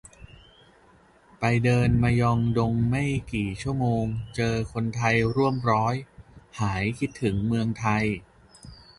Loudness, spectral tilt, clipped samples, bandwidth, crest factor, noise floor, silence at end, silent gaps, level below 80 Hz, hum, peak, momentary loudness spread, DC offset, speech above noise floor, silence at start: -25 LUFS; -7 dB/octave; under 0.1%; 11.5 kHz; 16 dB; -57 dBFS; 0.25 s; none; -44 dBFS; none; -8 dBFS; 8 LU; under 0.1%; 33 dB; 0.05 s